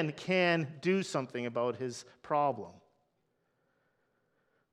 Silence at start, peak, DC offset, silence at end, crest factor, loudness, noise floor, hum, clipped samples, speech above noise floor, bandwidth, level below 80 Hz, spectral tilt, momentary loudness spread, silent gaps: 0 s; -14 dBFS; under 0.1%; 2 s; 20 dB; -32 LUFS; -78 dBFS; none; under 0.1%; 45 dB; 11.5 kHz; -80 dBFS; -5.5 dB/octave; 13 LU; none